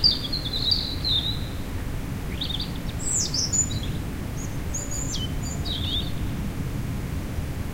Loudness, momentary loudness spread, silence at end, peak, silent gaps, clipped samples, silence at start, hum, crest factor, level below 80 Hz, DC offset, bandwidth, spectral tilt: -27 LUFS; 10 LU; 0 s; -6 dBFS; none; under 0.1%; 0 s; none; 20 dB; -34 dBFS; under 0.1%; 16 kHz; -3 dB/octave